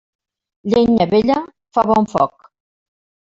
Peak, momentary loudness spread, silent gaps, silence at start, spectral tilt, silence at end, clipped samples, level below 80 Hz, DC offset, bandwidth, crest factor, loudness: -2 dBFS; 8 LU; none; 0.65 s; -7 dB/octave; 1.1 s; under 0.1%; -50 dBFS; under 0.1%; 7.6 kHz; 16 dB; -16 LUFS